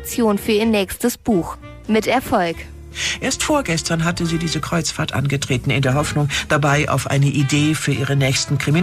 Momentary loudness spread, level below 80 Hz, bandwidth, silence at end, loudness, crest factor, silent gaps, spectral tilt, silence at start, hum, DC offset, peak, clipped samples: 4 LU; -40 dBFS; 15.5 kHz; 0 s; -18 LUFS; 14 dB; none; -5 dB/octave; 0 s; none; under 0.1%; -4 dBFS; under 0.1%